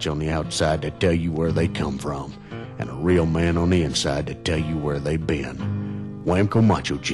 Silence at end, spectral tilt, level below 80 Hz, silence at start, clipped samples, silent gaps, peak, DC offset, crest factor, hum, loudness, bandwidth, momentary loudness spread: 0 s; -6 dB/octave; -38 dBFS; 0 s; under 0.1%; none; -10 dBFS; under 0.1%; 12 dB; none; -23 LUFS; 12 kHz; 11 LU